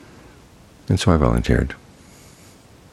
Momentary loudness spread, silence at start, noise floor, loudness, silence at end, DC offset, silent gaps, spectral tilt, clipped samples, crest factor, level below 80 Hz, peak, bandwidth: 20 LU; 0.9 s; -47 dBFS; -19 LUFS; 1.15 s; under 0.1%; none; -6.5 dB/octave; under 0.1%; 22 dB; -30 dBFS; 0 dBFS; 13.5 kHz